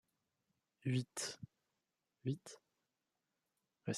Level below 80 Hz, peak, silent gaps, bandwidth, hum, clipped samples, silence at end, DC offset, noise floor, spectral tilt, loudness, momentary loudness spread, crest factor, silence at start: -82 dBFS; -26 dBFS; none; 13 kHz; none; under 0.1%; 0 s; under 0.1%; -90 dBFS; -5 dB/octave; -44 LUFS; 18 LU; 22 dB; 0.85 s